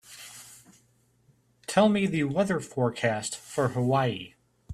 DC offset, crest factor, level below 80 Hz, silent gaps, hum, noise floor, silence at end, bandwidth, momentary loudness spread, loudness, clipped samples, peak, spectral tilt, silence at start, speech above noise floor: under 0.1%; 22 dB; -64 dBFS; none; none; -66 dBFS; 0 s; 14 kHz; 20 LU; -27 LUFS; under 0.1%; -6 dBFS; -5.5 dB/octave; 0.1 s; 40 dB